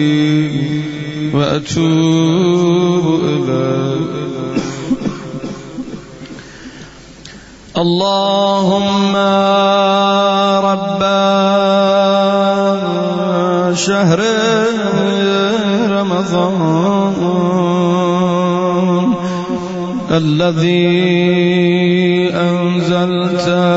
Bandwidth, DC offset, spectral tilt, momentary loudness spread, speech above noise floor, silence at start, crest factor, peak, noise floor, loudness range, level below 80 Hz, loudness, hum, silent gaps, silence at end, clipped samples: 8 kHz; under 0.1%; -6 dB/octave; 9 LU; 23 dB; 0 s; 12 dB; -2 dBFS; -35 dBFS; 7 LU; -50 dBFS; -13 LUFS; none; none; 0 s; under 0.1%